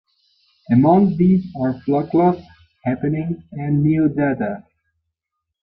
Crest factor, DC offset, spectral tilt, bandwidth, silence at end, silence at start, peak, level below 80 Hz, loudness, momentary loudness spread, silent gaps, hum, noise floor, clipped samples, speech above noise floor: 16 dB; under 0.1%; -12.5 dB/octave; 5.2 kHz; 1 s; 0.7 s; -4 dBFS; -54 dBFS; -18 LUFS; 13 LU; none; none; -80 dBFS; under 0.1%; 63 dB